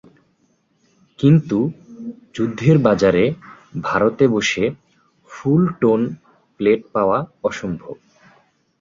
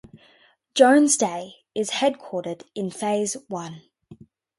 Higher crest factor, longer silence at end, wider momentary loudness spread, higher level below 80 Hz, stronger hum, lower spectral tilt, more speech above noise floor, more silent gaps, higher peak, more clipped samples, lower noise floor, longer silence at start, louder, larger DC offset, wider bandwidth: about the same, 18 dB vs 22 dB; first, 0.85 s vs 0.45 s; about the same, 18 LU vs 17 LU; first, -52 dBFS vs -68 dBFS; neither; first, -7 dB/octave vs -3 dB/octave; first, 45 dB vs 37 dB; neither; about the same, -2 dBFS vs -2 dBFS; neither; first, -63 dBFS vs -59 dBFS; first, 1.2 s vs 0.15 s; first, -18 LUFS vs -22 LUFS; neither; second, 7.6 kHz vs 11.5 kHz